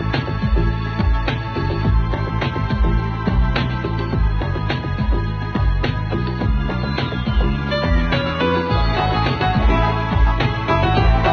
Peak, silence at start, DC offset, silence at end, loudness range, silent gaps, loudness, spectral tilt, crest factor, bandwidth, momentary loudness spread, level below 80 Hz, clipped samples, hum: -4 dBFS; 0 s; under 0.1%; 0 s; 3 LU; none; -19 LUFS; -8 dB/octave; 14 dB; 6.4 kHz; 5 LU; -22 dBFS; under 0.1%; none